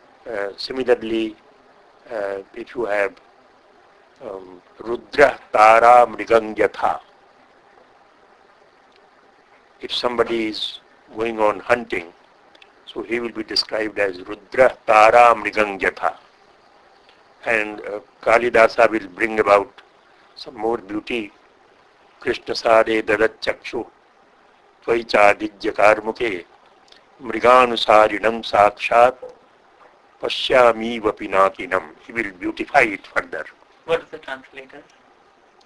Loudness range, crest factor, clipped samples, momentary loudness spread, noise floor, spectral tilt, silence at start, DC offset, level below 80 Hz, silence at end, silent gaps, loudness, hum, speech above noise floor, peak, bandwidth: 10 LU; 20 dB; under 0.1%; 19 LU; -54 dBFS; -4 dB/octave; 0.25 s; under 0.1%; -54 dBFS; 0.85 s; none; -18 LUFS; none; 35 dB; 0 dBFS; 11 kHz